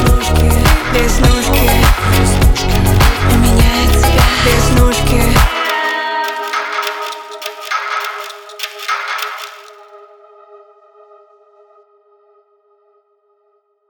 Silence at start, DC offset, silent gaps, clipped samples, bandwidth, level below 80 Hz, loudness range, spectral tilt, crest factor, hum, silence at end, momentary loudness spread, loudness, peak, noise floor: 0 s; under 0.1%; none; under 0.1%; over 20 kHz; -16 dBFS; 14 LU; -4.5 dB/octave; 14 dB; none; 4.3 s; 13 LU; -13 LUFS; 0 dBFS; -59 dBFS